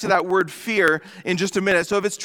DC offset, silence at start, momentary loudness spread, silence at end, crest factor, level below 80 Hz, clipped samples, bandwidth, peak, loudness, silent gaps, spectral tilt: under 0.1%; 0 s; 5 LU; 0 s; 16 dB; -60 dBFS; under 0.1%; 18.5 kHz; -4 dBFS; -21 LUFS; none; -4 dB/octave